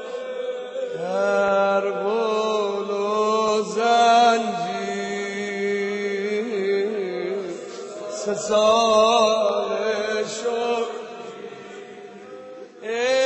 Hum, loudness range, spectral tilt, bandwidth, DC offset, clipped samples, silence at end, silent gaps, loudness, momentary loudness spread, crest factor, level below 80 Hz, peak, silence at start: none; 6 LU; -3.5 dB/octave; 9 kHz; under 0.1%; under 0.1%; 0 s; none; -22 LUFS; 19 LU; 18 dB; -66 dBFS; -6 dBFS; 0 s